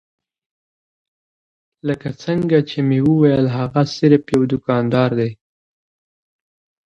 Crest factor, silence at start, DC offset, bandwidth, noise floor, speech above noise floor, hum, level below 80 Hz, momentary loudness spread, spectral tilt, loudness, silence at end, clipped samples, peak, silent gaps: 18 dB; 1.85 s; under 0.1%; 10 kHz; under -90 dBFS; over 74 dB; none; -54 dBFS; 10 LU; -8 dB/octave; -17 LUFS; 1.5 s; under 0.1%; 0 dBFS; none